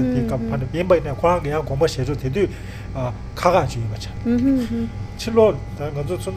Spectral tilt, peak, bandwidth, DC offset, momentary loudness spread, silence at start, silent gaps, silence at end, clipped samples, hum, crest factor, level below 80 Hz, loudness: -7 dB/octave; 0 dBFS; 15 kHz; under 0.1%; 10 LU; 0 s; none; 0 s; under 0.1%; none; 20 dB; -36 dBFS; -21 LUFS